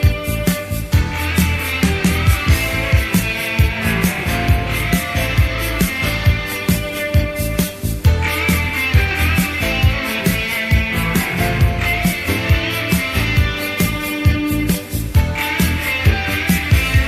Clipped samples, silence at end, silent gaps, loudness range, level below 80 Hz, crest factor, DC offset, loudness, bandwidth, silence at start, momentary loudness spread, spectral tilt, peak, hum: under 0.1%; 0 s; none; 1 LU; -22 dBFS; 14 dB; under 0.1%; -17 LUFS; 16 kHz; 0 s; 3 LU; -5 dB/octave; -2 dBFS; none